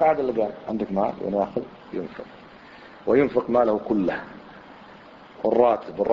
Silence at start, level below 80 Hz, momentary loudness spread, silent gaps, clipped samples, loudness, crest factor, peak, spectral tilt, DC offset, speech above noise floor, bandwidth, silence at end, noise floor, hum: 0 s; -56 dBFS; 24 LU; none; under 0.1%; -24 LUFS; 20 dB; -4 dBFS; -8.5 dB/octave; under 0.1%; 23 dB; 6.6 kHz; 0 s; -46 dBFS; none